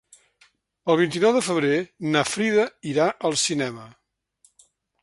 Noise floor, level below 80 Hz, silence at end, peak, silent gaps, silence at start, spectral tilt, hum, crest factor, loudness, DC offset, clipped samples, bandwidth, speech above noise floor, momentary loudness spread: -63 dBFS; -66 dBFS; 1.15 s; -4 dBFS; none; 0.85 s; -4 dB/octave; none; 20 dB; -22 LUFS; under 0.1%; under 0.1%; 11.5 kHz; 41 dB; 7 LU